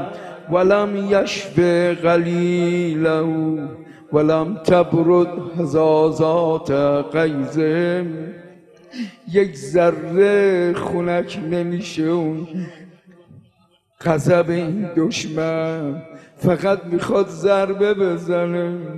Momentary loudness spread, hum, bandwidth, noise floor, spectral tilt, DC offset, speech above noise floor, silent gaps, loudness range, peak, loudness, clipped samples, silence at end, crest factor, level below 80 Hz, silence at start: 11 LU; none; 12 kHz; -59 dBFS; -7 dB/octave; under 0.1%; 41 dB; none; 5 LU; 0 dBFS; -19 LUFS; under 0.1%; 0 s; 18 dB; -56 dBFS; 0 s